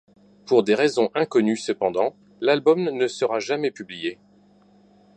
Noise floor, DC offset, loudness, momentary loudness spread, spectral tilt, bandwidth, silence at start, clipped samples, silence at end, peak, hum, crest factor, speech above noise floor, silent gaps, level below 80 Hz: -55 dBFS; under 0.1%; -22 LUFS; 10 LU; -5 dB/octave; 9.2 kHz; 0.45 s; under 0.1%; 1.05 s; -4 dBFS; 50 Hz at -55 dBFS; 18 dB; 34 dB; none; -70 dBFS